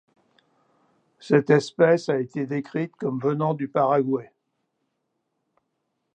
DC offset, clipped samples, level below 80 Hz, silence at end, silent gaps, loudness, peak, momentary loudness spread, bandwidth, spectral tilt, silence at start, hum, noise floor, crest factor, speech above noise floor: under 0.1%; under 0.1%; -74 dBFS; 1.9 s; none; -23 LUFS; -4 dBFS; 10 LU; 9.2 kHz; -7.5 dB/octave; 1.25 s; none; -77 dBFS; 20 dB; 55 dB